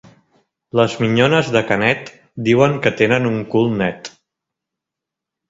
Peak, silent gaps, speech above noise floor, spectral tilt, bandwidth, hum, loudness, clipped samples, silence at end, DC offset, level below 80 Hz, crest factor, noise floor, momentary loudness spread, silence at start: 0 dBFS; none; 68 dB; -6 dB/octave; 7.8 kHz; none; -16 LUFS; under 0.1%; 1.4 s; under 0.1%; -52 dBFS; 18 dB; -84 dBFS; 9 LU; 0.75 s